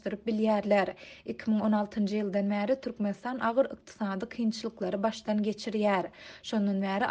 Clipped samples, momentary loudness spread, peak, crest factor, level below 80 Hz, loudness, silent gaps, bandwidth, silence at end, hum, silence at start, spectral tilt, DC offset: under 0.1%; 8 LU; -14 dBFS; 16 dB; -66 dBFS; -30 LUFS; none; 8.6 kHz; 0 s; none; 0.05 s; -6.5 dB/octave; under 0.1%